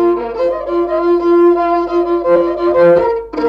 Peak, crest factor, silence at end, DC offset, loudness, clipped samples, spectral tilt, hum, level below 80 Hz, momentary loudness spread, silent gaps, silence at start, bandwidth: -2 dBFS; 10 dB; 0 s; under 0.1%; -13 LUFS; under 0.1%; -8 dB/octave; none; -42 dBFS; 7 LU; none; 0 s; 5.4 kHz